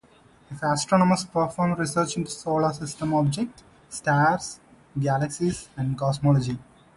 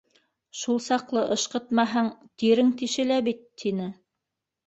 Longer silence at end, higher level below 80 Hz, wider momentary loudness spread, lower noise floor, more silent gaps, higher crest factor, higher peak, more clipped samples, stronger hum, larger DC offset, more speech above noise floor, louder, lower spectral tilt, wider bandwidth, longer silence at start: second, 0.35 s vs 0.75 s; first, -54 dBFS vs -70 dBFS; about the same, 12 LU vs 10 LU; second, -55 dBFS vs -85 dBFS; neither; about the same, 18 dB vs 18 dB; about the same, -6 dBFS vs -8 dBFS; neither; neither; neither; second, 32 dB vs 60 dB; about the same, -25 LUFS vs -26 LUFS; first, -5.5 dB/octave vs -4 dB/octave; first, 11.5 kHz vs 8.2 kHz; about the same, 0.5 s vs 0.55 s